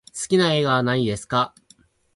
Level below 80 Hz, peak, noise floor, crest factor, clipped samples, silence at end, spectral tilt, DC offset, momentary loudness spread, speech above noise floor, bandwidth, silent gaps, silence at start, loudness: -56 dBFS; -6 dBFS; -57 dBFS; 16 dB; under 0.1%; 0.7 s; -5 dB/octave; under 0.1%; 5 LU; 37 dB; 11.5 kHz; none; 0.15 s; -21 LUFS